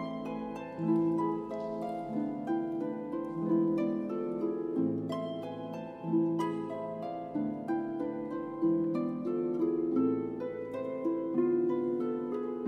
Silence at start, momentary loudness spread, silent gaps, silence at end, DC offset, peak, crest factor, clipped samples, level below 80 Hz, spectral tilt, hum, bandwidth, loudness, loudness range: 0 s; 8 LU; none; 0 s; under 0.1%; -18 dBFS; 14 dB; under 0.1%; -70 dBFS; -9 dB/octave; none; 6 kHz; -33 LUFS; 3 LU